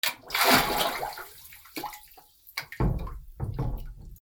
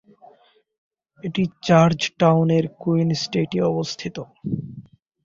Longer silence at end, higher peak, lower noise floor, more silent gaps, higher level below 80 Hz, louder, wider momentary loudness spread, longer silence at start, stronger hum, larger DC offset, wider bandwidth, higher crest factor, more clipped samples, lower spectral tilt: second, 0.05 s vs 0.45 s; second, -6 dBFS vs -2 dBFS; about the same, -54 dBFS vs -56 dBFS; neither; first, -40 dBFS vs -56 dBFS; second, -28 LUFS vs -21 LUFS; first, 22 LU vs 15 LU; second, 0.05 s vs 1.25 s; neither; neither; first, over 20 kHz vs 7.6 kHz; about the same, 24 dB vs 20 dB; neither; second, -3.5 dB/octave vs -6.5 dB/octave